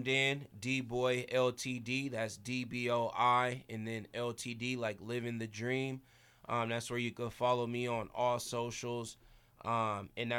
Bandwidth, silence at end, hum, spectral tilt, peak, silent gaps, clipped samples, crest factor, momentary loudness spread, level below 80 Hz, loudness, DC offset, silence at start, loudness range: 18.5 kHz; 0 s; none; -4.5 dB/octave; -18 dBFS; none; under 0.1%; 20 dB; 10 LU; -68 dBFS; -36 LUFS; under 0.1%; 0 s; 4 LU